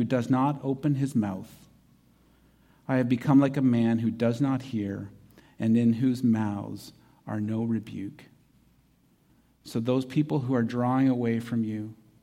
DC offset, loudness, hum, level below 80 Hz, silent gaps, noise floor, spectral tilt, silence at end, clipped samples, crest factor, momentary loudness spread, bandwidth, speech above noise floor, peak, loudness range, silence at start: under 0.1%; -27 LUFS; none; -66 dBFS; none; -64 dBFS; -8 dB/octave; 0.3 s; under 0.1%; 18 dB; 16 LU; 13.5 kHz; 38 dB; -10 dBFS; 7 LU; 0 s